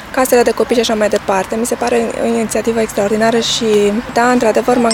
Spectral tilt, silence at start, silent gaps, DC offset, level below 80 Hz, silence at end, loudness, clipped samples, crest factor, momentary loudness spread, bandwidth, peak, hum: -3.5 dB/octave; 0 s; none; under 0.1%; -42 dBFS; 0 s; -13 LUFS; under 0.1%; 14 dB; 4 LU; 18.5 kHz; 0 dBFS; none